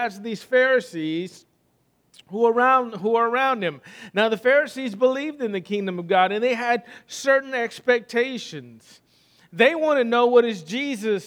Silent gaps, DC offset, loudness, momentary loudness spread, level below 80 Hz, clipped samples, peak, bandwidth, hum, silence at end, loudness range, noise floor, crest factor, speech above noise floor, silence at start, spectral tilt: none; under 0.1%; -21 LUFS; 12 LU; -78 dBFS; under 0.1%; -2 dBFS; 13.5 kHz; none; 0 s; 2 LU; -66 dBFS; 20 dB; 44 dB; 0 s; -4.5 dB/octave